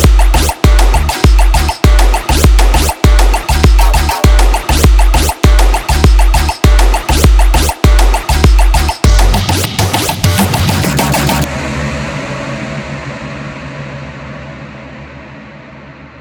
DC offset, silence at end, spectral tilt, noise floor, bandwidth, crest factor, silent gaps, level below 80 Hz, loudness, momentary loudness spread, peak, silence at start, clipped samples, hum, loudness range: under 0.1%; 0.2 s; -4.5 dB/octave; -32 dBFS; over 20 kHz; 8 dB; none; -10 dBFS; -11 LUFS; 16 LU; 0 dBFS; 0 s; under 0.1%; none; 12 LU